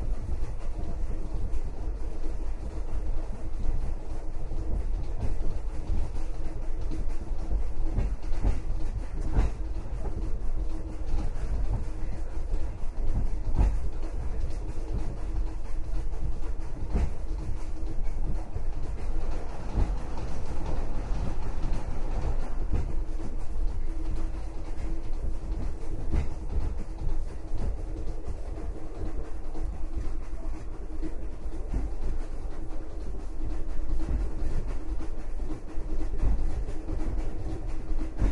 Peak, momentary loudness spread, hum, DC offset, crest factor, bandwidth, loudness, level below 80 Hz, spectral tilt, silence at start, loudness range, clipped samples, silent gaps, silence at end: -10 dBFS; 7 LU; none; under 0.1%; 14 dB; 6.4 kHz; -36 LUFS; -30 dBFS; -7.5 dB/octave; 0 s; 4 LU; under 0.1%; none; 0 s